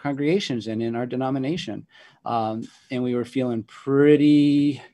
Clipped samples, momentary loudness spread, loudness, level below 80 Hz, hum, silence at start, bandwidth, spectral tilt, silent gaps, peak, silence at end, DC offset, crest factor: under 0.1%; 15 LU; -22 LUFS; -66 dBFS; none; 0.05 s; 8.8 kHz; -7 dB/octave; none; -4 dBFS; 0.05 s; under 0.1%; 18 dB